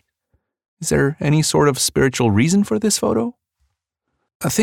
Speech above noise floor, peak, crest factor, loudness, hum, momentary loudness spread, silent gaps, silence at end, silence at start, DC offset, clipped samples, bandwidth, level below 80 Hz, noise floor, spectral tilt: 59 dB; -4 dBFS; 14 dB; -18 LUFS; none; 7 LU; 4.35-4.40 s; 0 s; 0.8 s; under 0.1%; under 0.1%; 18 kHz; -46 dBFS; -75 dBFS; -4.5 dB/octave